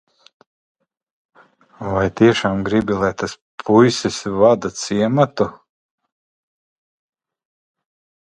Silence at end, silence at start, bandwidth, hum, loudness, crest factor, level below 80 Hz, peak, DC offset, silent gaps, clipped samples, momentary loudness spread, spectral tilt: 2.75 s; 1.8 s; 11 kHz; none; -17 LUFS; 20 dB; -48 dBFS; 0 dBFS; under 0.1%; 3.41-3.58 s; under 0.1%; 10 LU; -5.5 dB/octave